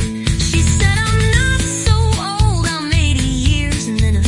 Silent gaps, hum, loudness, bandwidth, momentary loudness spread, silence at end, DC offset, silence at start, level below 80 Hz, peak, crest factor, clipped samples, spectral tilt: none; none; -15 LUFS; 11.5 kHz; 4 LU; 0 s; under 0.1%; 0 s; -20 dBFS; 0 dBFS; 14 dB; under 0.1%; -4.5 dB/octave